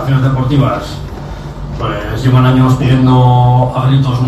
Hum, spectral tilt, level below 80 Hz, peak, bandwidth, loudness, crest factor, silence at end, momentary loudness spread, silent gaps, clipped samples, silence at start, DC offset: none; -8 dB/octave; -28 dBFS; 0 dBFS; 8.4 kHz; -11 LUFS; 10 dB; 0 s; 16 LU; none; 0.1%; 0 s; under 0.1%